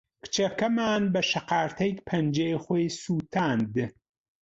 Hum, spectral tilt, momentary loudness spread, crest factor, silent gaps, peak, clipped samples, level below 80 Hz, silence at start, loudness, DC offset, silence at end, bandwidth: none; -5 dB/octave; 5 LU; 16 dB; none; -12 dBFS; under 0.1%; -62 dBFS; 0.25 s; -27 LUFS; under 0.1%; 0.5 s; 8 kHz